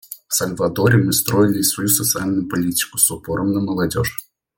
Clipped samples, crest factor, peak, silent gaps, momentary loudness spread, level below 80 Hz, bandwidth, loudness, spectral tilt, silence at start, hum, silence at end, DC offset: under 0.1%; 18 dB; 0 dBFS; none; 6 LU; -48 dBFS; 17 kHz; -18 LUFS; -4 dB/octave; 0.1 s; none; 0.35 s; under 0.1%